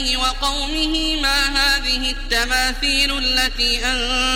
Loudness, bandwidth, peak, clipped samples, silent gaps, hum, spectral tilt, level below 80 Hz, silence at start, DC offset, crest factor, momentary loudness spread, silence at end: -17 LUFS; 16.5 kHz; -2 dBFS; under 0.1%; none; none; -1.5 dB/octave; -28 dBFS; 0 s; under 0.1%; 16 dB; 4 LU; 0 s